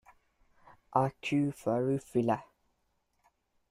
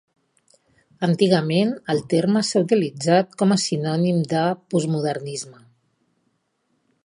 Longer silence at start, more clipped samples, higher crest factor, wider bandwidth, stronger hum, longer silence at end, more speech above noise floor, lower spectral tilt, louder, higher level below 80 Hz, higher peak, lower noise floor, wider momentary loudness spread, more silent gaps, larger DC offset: about the same, 0.9 s vs 1 s; neither; about the same, 22 dB vs 18 dB; first, 14.5 kHz vs 11 kHz; neither; second, 1.25 s vs 1.55 s; second, 46 dB vs 50 dB; first, -7.5 dB/octave vs -5.5 dB/octave; second, -32 LUFS vs -21 LUFS; about the same, -68 dBFS vs -66 dBFS; second, -12 dBFS vs -4 dBFS; first, -77 dBFS vs -70 dBFS; second, 2 LU vs 8 LU; neither; neither